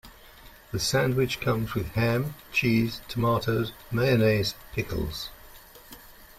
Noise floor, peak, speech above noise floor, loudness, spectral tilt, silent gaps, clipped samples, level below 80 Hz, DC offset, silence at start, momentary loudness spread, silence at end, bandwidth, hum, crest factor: -50 dBFS; -10 dBFS; 24 dB; -27 LUFS; -5.5 dB/octave; none; under 0.1%; -48 dBFS; under 0.1%; 0.05 s; 14 LU; 0.15 s; 16 kHz; none; 18 dB